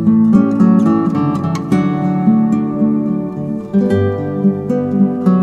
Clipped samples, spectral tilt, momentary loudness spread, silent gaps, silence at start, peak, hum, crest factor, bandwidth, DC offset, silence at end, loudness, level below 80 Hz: under 0.1%; -9.5 dB/octave; 7 LU; none; 0 s; 0 dBFS; none; 12 dB; 7.4 kHz; under 0.1%; 0 s; -14 LUFS; -48 dBFS